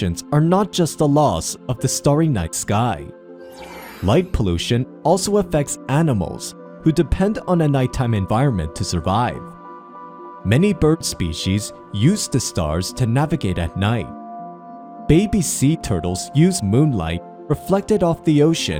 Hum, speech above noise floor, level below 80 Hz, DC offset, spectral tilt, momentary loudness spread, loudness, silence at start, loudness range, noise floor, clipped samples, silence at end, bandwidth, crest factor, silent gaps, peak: none; 20 dB; -36 dBFS; under 0.1%; -5.5 dB/octave; 18 LU; -19 LUFS; 0 s; 2 LU; -38 dBFS; under 0.1%; 0 s; 16.5 kHz; 18 dB; none; 0 dBFS